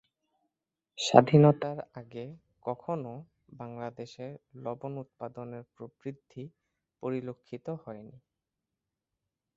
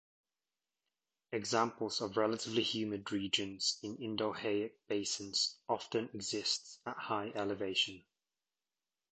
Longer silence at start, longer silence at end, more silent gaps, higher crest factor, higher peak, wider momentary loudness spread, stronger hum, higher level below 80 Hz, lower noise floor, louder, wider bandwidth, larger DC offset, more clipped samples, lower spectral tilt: second, 0.95 s vs 1.3 s; first, 1.5 s vs 1.1 s; neither; first, 30 dB vs 22 dB; first, -2 dBFS vs -18 dBFS; first, 24 LU vs 6 LU; neither; about the same, -70 dBFS vs -74 dBFS; about the same, -88 dBFS vs under -90 dBFS; first, -29 LUFS vs -36 LUFS; second, 7.6 kHz vs 9 kHz; neither; neither; first, -6.5 dB/octave vs -3 dB/octave